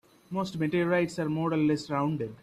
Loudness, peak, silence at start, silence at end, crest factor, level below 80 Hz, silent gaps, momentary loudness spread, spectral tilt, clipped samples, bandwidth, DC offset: -29 LUFS; -14 dBFS; 0.3 s; 0.05 s; 14 dB; -64 dBFS; none; 7 LU; -7 dB/octave; under 0.1%; 13 kHz; under 0.1%